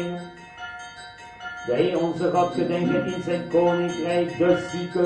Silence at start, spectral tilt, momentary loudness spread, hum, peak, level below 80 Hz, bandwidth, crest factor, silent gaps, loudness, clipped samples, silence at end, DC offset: 0 s; -6.5 dB/octave; 17 LU; none; -8 dBFS; -58 dBFS; 9.8 kHz; 16 dB; none; -23 LUFS; under 0.1%; 0 s; under 0.1%